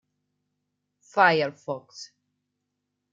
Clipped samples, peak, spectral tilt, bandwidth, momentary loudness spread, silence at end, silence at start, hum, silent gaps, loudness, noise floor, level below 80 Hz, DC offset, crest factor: under 0.1%; -4 dBFS; -4.5 dB/octave; 7.8 kHz; 23 LU; 1.05 s; 1.15 s; 50 Hz at -60 dBFS; none; -23 LUFS; -81 dBFS; -82 dBFS; under 0.1%; 24 dB